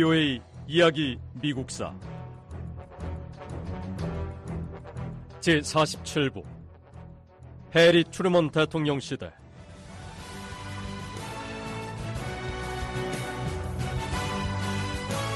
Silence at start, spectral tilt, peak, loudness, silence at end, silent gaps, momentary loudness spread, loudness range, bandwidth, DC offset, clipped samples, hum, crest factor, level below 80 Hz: 0 s; -5 dB/octave; -10 dBFS; -28 LUFS; 0 s; none; 20 LU; 12 LU; 12.5 kHz; under 0.1%; under 0.1%; none; 18 dB; -44 dBFS